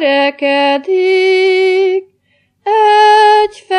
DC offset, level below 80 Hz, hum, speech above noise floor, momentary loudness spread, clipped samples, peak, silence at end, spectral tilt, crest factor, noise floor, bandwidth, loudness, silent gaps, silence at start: under 0.1%; -62 dBFS; none; 47 dB; 9 LU; under 0.1%; 0 dBFS; 0 s; -2 dB/octave; 10 dB; -58 dBFS; 10.5 kHz; -10 LUFS; none; 0 s